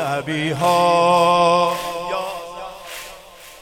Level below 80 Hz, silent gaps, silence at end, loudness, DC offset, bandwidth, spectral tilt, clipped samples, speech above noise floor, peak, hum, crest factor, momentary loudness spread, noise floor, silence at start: -52 dBFS; none; 0 s; -17 LUFS; under 0.1%; 17 kHz; -4.5 dB/octave; under 0.1%; 25 dB; -2 dBFS; none; 16 dB; 18 LU; -41 dBFS; 0 s